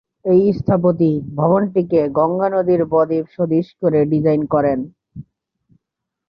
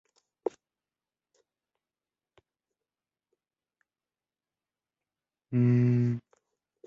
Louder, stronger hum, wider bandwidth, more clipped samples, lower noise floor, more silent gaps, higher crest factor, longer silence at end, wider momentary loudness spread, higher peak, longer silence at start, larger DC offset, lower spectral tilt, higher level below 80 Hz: first, -17 LUFS vs -28 LUFS; neither; first, 5.4 kHz vs 4.9 kHz; neither; second, -81 dBFS vs under -90 dBFS; neither; about the same, 14 dB vs 18 dB; first, 1.05 s vs 0.7 s; second, 4 LU vs 14 LU; first, -2 dBFS vs -16 dBFS; second, 0.25 s vs 0.45 s; neither; about the same, -11.5 dB/octave vs -10.5 dB/octave; first, -50 dBFS vs -72 dBFS